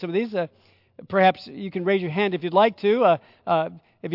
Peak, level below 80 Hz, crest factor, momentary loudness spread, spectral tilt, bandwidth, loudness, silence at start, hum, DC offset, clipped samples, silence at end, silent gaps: -6 dBFS; -72 dBFS; 18 dB; 13 LU; -8.5 dB/octave; 5.8 kHz; -22 LUFS; 0 s; none; under 0.1%; under 0.1%; 0 s; none